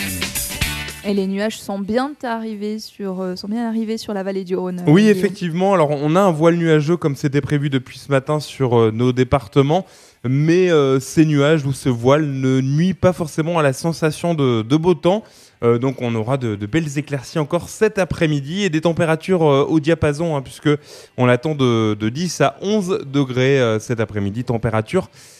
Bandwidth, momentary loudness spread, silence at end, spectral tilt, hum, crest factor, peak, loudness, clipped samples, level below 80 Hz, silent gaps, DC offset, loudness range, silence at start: 14 kHz; 9 LU; 0.35 s; -6.5 dB/octave; none; 18 dB; 0 dBFS; -18 LUFS; under 0.1%; -46 dBFS; none; under 0.1%; 4 LU; 0 s